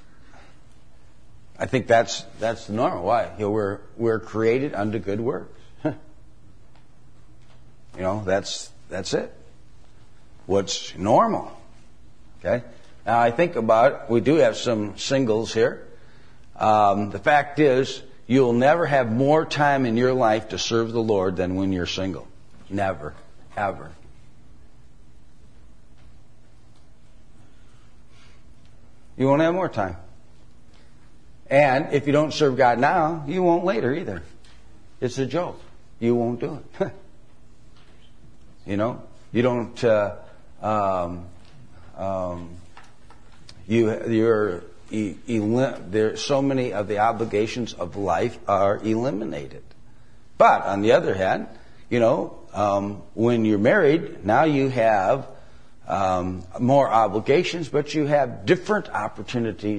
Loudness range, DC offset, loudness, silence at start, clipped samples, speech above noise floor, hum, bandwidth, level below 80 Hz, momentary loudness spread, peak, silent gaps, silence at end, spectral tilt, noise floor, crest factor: 9 LU; 0.9%; -22 LUFS; 1.6 s; under 0.1%; 31 dB; none; 10.5 kHz; -54 dBFS; 13 LU; -4 dBFS; none; 0 s; -6 dB/octave; -52 dBFS; 20 dB